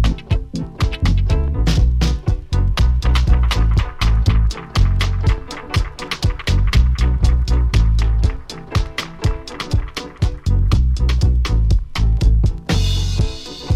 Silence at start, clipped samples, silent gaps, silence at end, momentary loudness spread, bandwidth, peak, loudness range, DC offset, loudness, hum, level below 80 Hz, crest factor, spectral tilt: 0 s; under 0.1%; none; 0 s; 7 LU; 11 kHz; -2 dBFS; 3 LU; under 0.1%; -19 LUFS; none; -18 dBFS; 12 dB; -6 dB/octave